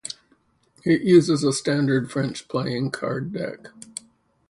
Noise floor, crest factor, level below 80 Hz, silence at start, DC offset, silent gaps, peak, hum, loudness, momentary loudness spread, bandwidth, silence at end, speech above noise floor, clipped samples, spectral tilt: -63 dBFS; 20 dB; -62 dBFS; 0.05 s; under 0.1%; none; -4 dBFS; none; -22 LUFS; 21 LU; 11.5 kHz; 0.8 s; 41 dB; under 0.1%; -5.5 dB/octave